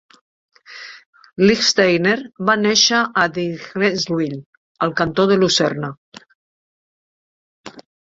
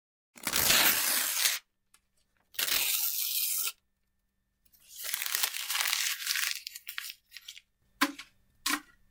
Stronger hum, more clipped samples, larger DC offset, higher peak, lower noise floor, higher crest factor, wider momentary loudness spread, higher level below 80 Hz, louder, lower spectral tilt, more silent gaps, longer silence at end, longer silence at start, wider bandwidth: neither; neither; neither; first, -2 dBFS vs -8 dBFS; second, -38 dBFS vs -78 dBFS; second, 18 dB vs 26 dB; first, 20 LU vs 16 LU; first, -56 dBFS vs -68 dBFS; first, -17 LUFS vs -28 LUFS; first, -3.5 dB/octave vs 1 dB/octave; first, 1.06-1.13 s, 4.46-4.75 s, 5.97-6.12 s, 6.35-7.64 s vs none; about the same, 0.2 s vs 0.3 s; first, 0.7 s vs 0.35 s; second, 7.8 kHz vs 19 kHz